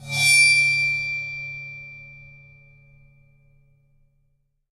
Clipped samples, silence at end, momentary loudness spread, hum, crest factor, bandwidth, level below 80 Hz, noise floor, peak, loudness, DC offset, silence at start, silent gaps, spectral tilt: under 0.1%; 2.45 s; 25 LU; none; 20 dB; 16 kHz; -58 dBFS; -68 dBFS; -6 dBFS; -17 LUFS; under 0.1%; 0 s; none; 0 dB/octave